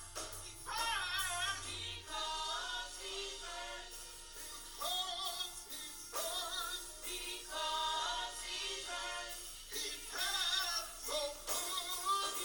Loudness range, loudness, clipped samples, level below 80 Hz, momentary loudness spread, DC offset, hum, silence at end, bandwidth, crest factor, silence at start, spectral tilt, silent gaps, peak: 4 LU; -39 LUFS; under 0.1%; -58 dBFS; 9 LU; under 0.1%; none; 0 s; over 20 kHz; 18 dB; 0 s; 0.5 dB/octave; none; -24 dBFS